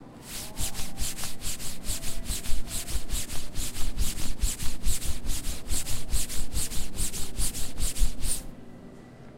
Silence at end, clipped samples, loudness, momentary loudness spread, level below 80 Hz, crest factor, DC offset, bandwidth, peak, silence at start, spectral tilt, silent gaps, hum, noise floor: 0.05 s; under 0.1%; -33 LUFS; 5 LU; -32 dBFS; 16 dB; under 0.1%; 16 kHz; -8 dBFS; 0 s; -2.5 dB/octave; none; none; -46 dBFS